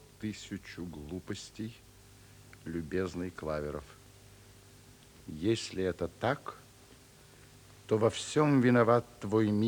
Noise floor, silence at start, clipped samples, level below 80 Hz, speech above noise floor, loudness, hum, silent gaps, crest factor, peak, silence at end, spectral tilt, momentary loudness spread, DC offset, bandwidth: -57 dBFS; 0.2 s; under 0.1%; -60 dBFS; 26 dB; -32 LUFS; none; none; 20 dB; -14 dBFS; 0 s; -6 dB/octave; 20 LU; under 0.1%; over 20 kHz